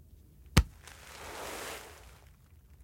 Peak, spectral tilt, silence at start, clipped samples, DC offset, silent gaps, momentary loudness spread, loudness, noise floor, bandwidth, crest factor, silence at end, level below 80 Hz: -4 dBFS; -4.5 dB/octave; 0.4 s; under 0.1%; under 0.1%; none; 22 LU; -35 LUFS; -58 dBFS; 16.5 kHz; 34 dB; 0 s; -40 dBFS